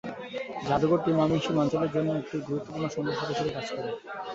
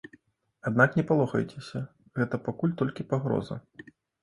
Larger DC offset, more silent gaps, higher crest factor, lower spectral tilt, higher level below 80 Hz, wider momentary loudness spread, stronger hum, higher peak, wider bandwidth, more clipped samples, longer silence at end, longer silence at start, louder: neither; neither; second, 16 dB vs 22 dB; second, -6.5 dB/octave vs -8 dB/octave; about the same, -58 dBFS vs -62 dBFS; second, 11 LU vs 14 LU; neither; second, -12 dBFS vs -6 dBFS; second, 7.8 kHz vs 11.5 kHz; neither; second, 0 s vs 0.4 s; second, 0.05 s vs 0.65 s; about the same, -29 LUFS vs -28 LUFS